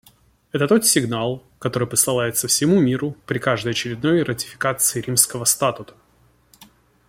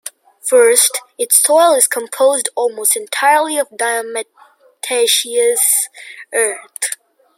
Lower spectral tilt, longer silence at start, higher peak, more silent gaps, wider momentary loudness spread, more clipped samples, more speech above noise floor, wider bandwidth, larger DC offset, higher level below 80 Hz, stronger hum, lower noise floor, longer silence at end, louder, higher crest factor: first, -3.5 dB/octave vs 2 dB/octave; first, 0.55 s vs 0.05 s; about the same, 0 dBFS vs 0 dBFS; neither; second, 10 LU vs 15 LU; neither; first, 38 dB vs 20 dB; about the same, 16.5 kHz vs 16.5 kHz; neither; first, -56 dBFS vs -76 dBFS; neither; first, -58 dBFS vs -34 dBFS; about the same, 0.45 s vs 0.45 s; second, -19 LUFS vs -13 LUFS; about the same, 20 dB vs 16 dB